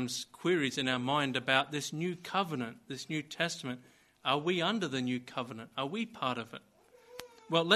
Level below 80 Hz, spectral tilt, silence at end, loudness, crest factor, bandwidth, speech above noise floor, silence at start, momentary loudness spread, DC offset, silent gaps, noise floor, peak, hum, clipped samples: -76 dBFS; -4 dB/octave; 0 s; -34 LUFS; 24 dB; 13 kHz; 24 dB; 0 s; 14 LU; under 0.1%; none; -57 dBFS; -10 dBFS; none; under 0.1%